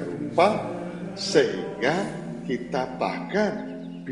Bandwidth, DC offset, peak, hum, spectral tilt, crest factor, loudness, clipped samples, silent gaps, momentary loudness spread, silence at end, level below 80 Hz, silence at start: 11.5 kHz; under 0.1%; -6 dBFS; none; -5 dB/octave; 20 dB; -26 LUFS; under 0.1%; none; 12 LU; 0 s; -60 dBFS; 0 s